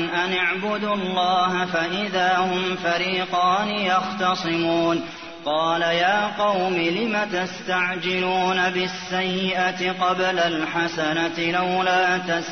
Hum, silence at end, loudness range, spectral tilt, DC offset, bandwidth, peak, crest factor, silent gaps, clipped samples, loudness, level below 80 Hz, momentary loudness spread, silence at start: none; 0 s; 1 LU; -4.5 dB/octave; 0.2%; 6.6 kHz; -8 dBFS; 16 dB; none; under 0.1%; -22 LUFS; -62 dBFS; 4 LU; 0 s